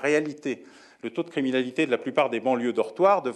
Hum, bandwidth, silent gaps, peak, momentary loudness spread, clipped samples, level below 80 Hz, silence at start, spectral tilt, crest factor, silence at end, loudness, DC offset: none; 11.5 kHz; none; -8 dBFS; 12 LU; under 0.1%; -82 dBFS; 0 s; -5.5 dB/octave; 18 dB; 0 s; -26 LUFS; under 0.1%